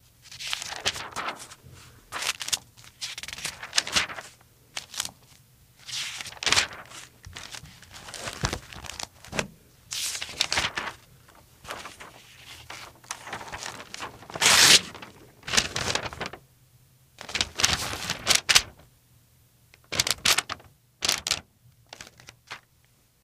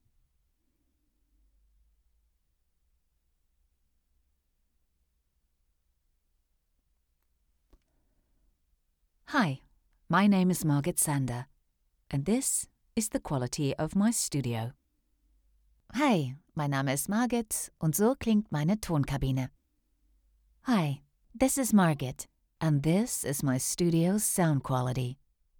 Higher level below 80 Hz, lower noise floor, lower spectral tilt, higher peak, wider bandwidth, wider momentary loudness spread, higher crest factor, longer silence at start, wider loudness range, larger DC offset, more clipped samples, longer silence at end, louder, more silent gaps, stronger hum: about the same, -52 dBFS vs -56 dBFS; second, -63 dBFS vs -75 dBFS; second, 0 dB/octave vs -5 dB/octave; first, 0 dBFS vs -12 dBFS; second, 16 kHz vs over 20 kHz; first, 23 LU vs 11 LU; first, 30 dB vs 20 dB; second, 0.25 s vs 9.3 s; first, 11 LU vs 3 LU; neither; neither; first, 0.65 s vs 0.45 s; first, -25 LUFS vs -29 LUFS; neither; neither